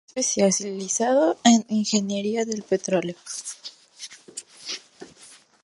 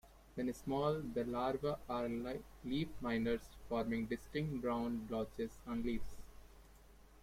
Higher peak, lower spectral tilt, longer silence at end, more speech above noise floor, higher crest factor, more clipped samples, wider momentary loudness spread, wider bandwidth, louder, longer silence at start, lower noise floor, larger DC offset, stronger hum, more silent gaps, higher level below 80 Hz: first, -4 dBFS vs -22 dBFS; second, -3.5 dB/octave vs -7 dB/octave; first, 0.3 s vs 0 s; first, 28 dB vs 22 dB; about the same, 22 dB vs 18 dB; neither; first, 21 LU vs 7 LU; second, 11.5 kHz vs 16 kHz; first, -23 LUFS vs -41 LUFS; about the same, 0.15 s vs 0.05 s; second, -51 dBFS vs -62 dBFS; neither; neither; neither; second, -72 dBFS vs -58 dBFS